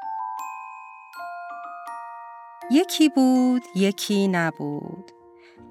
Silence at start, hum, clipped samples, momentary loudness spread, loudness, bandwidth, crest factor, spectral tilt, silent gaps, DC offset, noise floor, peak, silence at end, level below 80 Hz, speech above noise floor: 0 s; none; under 0.1%; 21 LU; -22 LUFS; 14.5 kHz; 16 dB; -5 dB/octave; none; under 0.1%; -49 dBFS; -8 dBFS; 0 s; -76 dBFS; 28 dB